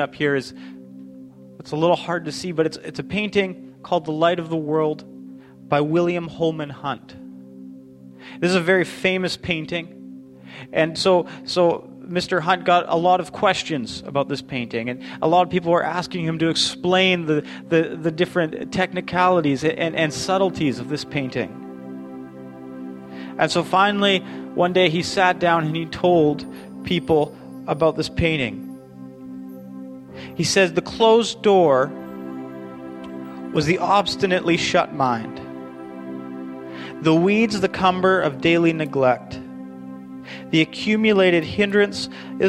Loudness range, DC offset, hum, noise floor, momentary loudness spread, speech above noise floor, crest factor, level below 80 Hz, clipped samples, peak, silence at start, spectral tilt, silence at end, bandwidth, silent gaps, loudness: 5 LU; under 0.1%; none; -43 dBFS; 19 LU; 23 dB; 20 dB; -52 dBFS; under 0.1%; -2 dBFS; 0 s; -5 dB/octave; 0 s; 12.5 kHz; none; -20 LUFS